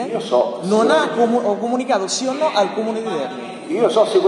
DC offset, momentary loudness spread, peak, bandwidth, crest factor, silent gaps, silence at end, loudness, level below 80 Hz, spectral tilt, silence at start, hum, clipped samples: under 0.1%; 9 LU; -4 dBFS; 11.5 kHz; 14 dB; none; 0 s; -18 LUFS; -68 dBFS; -4 dB/octave; 0 s; none; under 0.1%